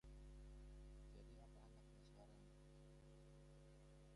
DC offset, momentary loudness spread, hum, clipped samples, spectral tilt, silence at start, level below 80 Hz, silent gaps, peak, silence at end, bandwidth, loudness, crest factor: under 0.1%; 4 LU; none; under 0.1%; -6.5 dB/octave; 0.05 s; -64 dBFS; none; -52 dBFS; 0 s; 11 kHz; -66 LUFS; 10 dB